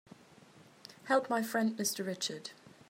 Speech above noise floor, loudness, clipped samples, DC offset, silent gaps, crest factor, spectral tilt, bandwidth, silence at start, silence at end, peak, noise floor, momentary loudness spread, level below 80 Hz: 26 dB; -34 LUFS; under 0.1%; under 0.1%; none; 22 dB; -3 dB/octave; 16 kHz; 0.55 s; 0.2 s; -16 dBFS; -59 dBFS; 20 LU; -86 dBFS